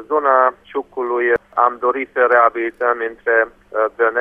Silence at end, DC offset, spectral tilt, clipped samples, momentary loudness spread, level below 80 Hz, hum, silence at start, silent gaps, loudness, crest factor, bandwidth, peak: 0 s; under 0.1%; -6.5 dB/octave; under 0.1%; 8 LU; -58 dBFS; none; 0 s; none; -17 LUFS; 16 dB; 3.6 kHz; 0 dBFS